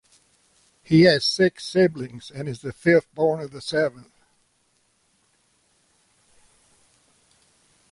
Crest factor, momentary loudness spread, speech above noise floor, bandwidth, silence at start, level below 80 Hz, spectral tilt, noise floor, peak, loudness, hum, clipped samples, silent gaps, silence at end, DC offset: 18 dB; 16 LU; 46 dB; 11.5 kHz; 0.9 s; -60 dBFS; -6 dB/octave; -67 dBFS; -6 dBFS; -21 LUFS; none; under 0.1%; none; 3.9 s; under 0.1%